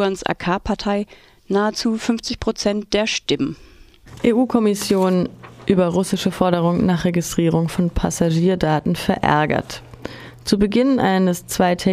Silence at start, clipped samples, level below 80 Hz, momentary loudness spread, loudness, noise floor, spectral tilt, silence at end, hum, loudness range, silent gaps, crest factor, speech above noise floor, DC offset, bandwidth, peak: 0 s; under 0.1%; -40 dBFS; 8 LU; -19 LUFS; -42 dBFS; -5.5 dB/octave; 0 s; none; 3 LU; none; 18 dB; 24 dB; under 0.1%; 15.5 kHz; 0 dBFS